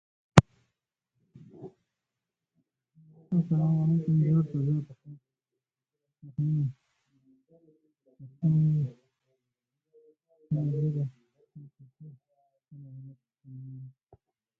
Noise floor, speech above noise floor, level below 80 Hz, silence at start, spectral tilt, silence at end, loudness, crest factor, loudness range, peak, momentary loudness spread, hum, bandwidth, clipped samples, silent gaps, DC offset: -88 dBFS; 61 dB; -54 dBFS; 0.35 s; -7.5 dB/octave; 0.7 s; -27 LUFS; 32 dB; 9 LU; 0 dBFS; 26 LU; none; 9.2 kHz; under 0.1%; none; under 0.1%